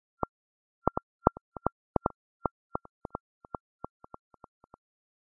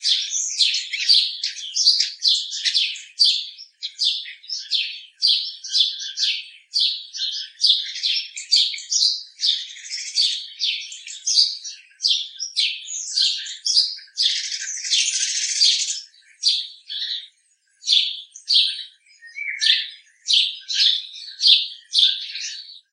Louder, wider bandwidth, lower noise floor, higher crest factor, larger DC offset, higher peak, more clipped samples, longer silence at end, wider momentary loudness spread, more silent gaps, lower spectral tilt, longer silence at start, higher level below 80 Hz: second, -37 LUFS vs -19 LUFS; second, 1.5 kHz vs 10.5 kHz; first, under -90 dBFS vs -63 dBFS; first, 38 dB vs 22 dB; neither; about the same, 0 dBFS vs 0 dBFS; neither; first, 3.55 s vs 0.15 s; first, 18 LU vs 13 LU; first, 1.03-1.19 s, 1.41-1.52 s vs none; first, -0.5 dB/octave vs 15 dB/octave; first, 0.85 s vs 0 s; first, -50 dBFS vs under -90 dBFS